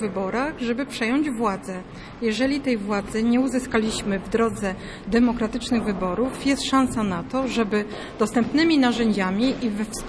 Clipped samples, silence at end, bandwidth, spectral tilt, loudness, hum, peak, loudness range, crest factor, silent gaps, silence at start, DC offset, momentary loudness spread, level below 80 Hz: under 0.1%; 0 s; 11 kHz; -5 dB/octave; -23 LUFS; none; -8 dBFS; 2 LU; 16 dB; none; 0 s; under 0.1%; 6 LU; -44 dBFS